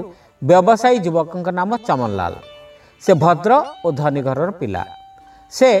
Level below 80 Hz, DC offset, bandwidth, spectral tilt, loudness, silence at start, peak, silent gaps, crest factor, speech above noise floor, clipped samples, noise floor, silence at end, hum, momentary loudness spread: -54 dBFS; under 0.1%; 13 kHz; -6.5 dB/octave; -17 LUFS; 0 s; 0 dBFS; none; 16 dB; 28 dB; under 0.1%; -44 dBFS; 0 s; none; 13 LU